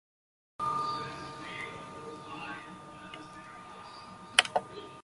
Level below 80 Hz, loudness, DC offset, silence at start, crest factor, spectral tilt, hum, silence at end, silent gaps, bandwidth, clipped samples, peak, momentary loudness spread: -68 dBFS; -33 LUFS; under 0.1%; 0.6 s; 34 dB; -1.5 dB/octave; none; 0 s; none; 11.5 kHz; under 0.1%; -4 dBFS; 20 LU